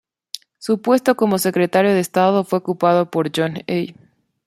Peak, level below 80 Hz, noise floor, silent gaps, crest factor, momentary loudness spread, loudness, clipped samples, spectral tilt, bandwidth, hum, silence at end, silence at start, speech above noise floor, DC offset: -2 dBFS; -64 dBFS; -38 dBFS; none; 16 dB; 14 LU; -18 LUFS; under 0.1%; -5.5 dB/octave; 16 kHz; none; 0.55 s; 0.35 s; 21 dB; under 0.1%